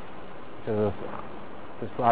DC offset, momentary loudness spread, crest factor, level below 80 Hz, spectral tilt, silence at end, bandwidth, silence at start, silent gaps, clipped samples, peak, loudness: 2%; 15 LU; 22 dB; -54 dBFS; -6.5 dB/octave; 0 s; 4 kHz; 0 s; none; under 0.1%; -8 dBFS; -32 LUFS